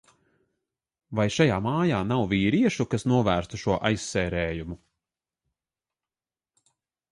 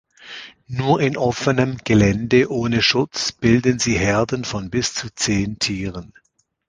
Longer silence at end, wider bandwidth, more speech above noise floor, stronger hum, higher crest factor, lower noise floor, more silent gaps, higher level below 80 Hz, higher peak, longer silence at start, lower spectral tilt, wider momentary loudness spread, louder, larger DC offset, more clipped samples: first, 2.35 s vs 0.6 s; first, 11.5 kHz vs 10 kHz; first, over 65 dB vs 20 dB; neither; about the same, 20 dB vs 18 dB; first, under -90 dBFS vs -39 dBFS; neither; second, -48 dBFS vs -42 dBFS; second, -8 dBFS vs -2 dBFS; first, 1.1 s vs 0.2 s; first, -6 dB/octave vs -4.5 dB/octave; second, 9 LU vs 13 LU; second, -25 LUFS vs -19 LUFS; neither; neither